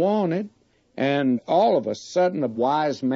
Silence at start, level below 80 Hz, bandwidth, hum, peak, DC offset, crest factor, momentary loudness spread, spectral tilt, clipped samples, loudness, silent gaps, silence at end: 0 s; -72 dBFS; 7.8 kHz; none; -8 dBFS; under 0.1%; 14 dB; 8 LU; -6.5 dB/octave; under 0.1%; -23 LUFS; none; 0 s